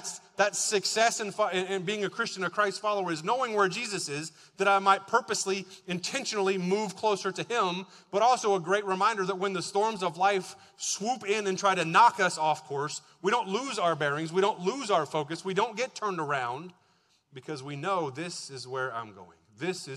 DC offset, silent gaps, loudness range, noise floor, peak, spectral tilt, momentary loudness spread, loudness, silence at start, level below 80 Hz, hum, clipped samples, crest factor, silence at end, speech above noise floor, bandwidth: under 0.1%; none; 6 LU; -68 dBFS; -8 dBFS; -3 dB/octave; 11 LU; -29 LUFS; 0 s; -80 dBFS; none; under 0.1%; 22 dB; 0 s; 39 dB; 14 kHz